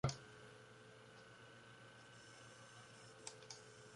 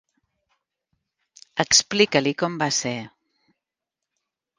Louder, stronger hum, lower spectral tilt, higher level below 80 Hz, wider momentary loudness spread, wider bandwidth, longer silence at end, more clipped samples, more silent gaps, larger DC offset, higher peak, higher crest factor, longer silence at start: second, -57 LUFS vs -21 LUFS; neither; first, -4.5 dB/octave vs -2.5 dB/octave; second, -72 dBFS vs -64 dBFS; second, 6 LU vs 13 LU; about the same, 11.5 kHz vs 10.5 kHz; second, 0 s vs 1.5 s; neither; neither; neither; second, -26 dBFS vs 0 dBFS; about the same, 28 dB vs 26 dB; second, 0.05 s vs 1.55 s